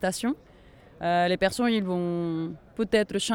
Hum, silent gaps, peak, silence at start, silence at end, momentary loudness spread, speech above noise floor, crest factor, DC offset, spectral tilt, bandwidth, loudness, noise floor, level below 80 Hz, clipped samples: none; none; -10 dBFS; 0 s; 0 s; 9 LU; 26 dB; 18 dB; under 0.1%; -5 dB/octave; 17 kHz; -27 LUFS; -52 dBFS; -56 dBFS; under 0.1%